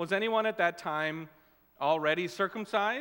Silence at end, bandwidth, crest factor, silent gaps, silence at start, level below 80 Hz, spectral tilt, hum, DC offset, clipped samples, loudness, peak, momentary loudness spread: 0 s; 16.5 kHz; 18 dB; none; 0 s; -78 dBFS; -5 dB/octave; none; under 0.1%; under 0.1%; -30 LUFS; -12 dBFS; 7 LU